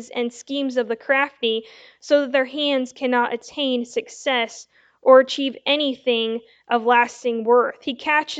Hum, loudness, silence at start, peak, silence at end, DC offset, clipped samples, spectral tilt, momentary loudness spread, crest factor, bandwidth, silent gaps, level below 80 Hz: none; -21 LUFS; 0 s; 0 dBFS; 0 s; under 0.1%; under 0.1%; -2.5 dB/octave; 10 LU; 20 dB; 8.2 kHz; none; -74 dBFS